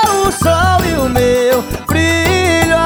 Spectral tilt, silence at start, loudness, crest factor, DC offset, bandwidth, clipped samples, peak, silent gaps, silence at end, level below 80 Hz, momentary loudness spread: -4.5 dB/octave; 0 s; -12 LUFS; 10 dB; under 0.1%; over 20 kHz; under 0.1%; -2 dBFS; none; 0 s; -30 dBFS; 3 LU